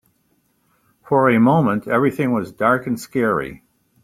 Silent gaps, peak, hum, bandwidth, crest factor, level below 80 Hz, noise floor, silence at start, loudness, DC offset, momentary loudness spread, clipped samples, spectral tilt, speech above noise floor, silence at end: none; -2 dBFS; none; 15.5 kHz; 18 dB; -56 dBFS; -64 dBFS; 1.1 s; -18 LUFS; under 0.1%; 8 LU; under 0.1%; -7.5 dB/octave; 47 dB; 0.5 s